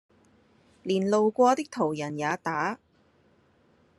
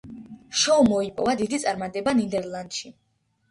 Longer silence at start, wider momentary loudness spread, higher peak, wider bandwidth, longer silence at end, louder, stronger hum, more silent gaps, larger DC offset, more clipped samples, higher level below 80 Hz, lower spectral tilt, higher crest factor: first, 0.85 s vs 0.05 s; second, 10 LU vs 17 LU; about the same, -10 dBFS vs -8 dBFS; about the same, 12 kHz vs 11.5 kHz; first, 1.2 s vs 0.6 s; about the same, -26 LUFS vs -24 LUFS; neither; neither; neither; neither; second, -74 dBFS vs -56 dBFS; first, -5.5 dB/octave vs -3.5 dB/octave; about the same, 20 dB vs 16 dB